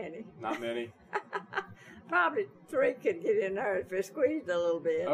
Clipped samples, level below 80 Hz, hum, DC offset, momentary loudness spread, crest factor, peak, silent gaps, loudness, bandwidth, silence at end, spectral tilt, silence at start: under 0.1%; -74 dBFS; none; under 0.1%; 10 LU; 18 dB; -14 dBFS; none; -32 LUFS; 15 kHz; 0 s; -5 dB/octave; 0 s